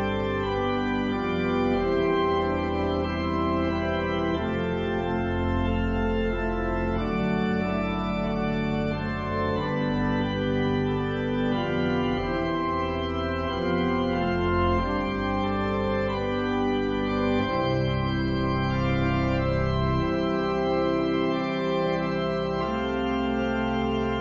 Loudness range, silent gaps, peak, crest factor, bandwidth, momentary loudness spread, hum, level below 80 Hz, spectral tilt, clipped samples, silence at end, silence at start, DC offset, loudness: 1 LU; none; -12 dBFS; 14 dB; 7.6 kHz; 3 LU; none; -38 dBFS; -8 dB/octave; under 0.1%; 0 s; 0 s; under 0.1%; -26 LUFS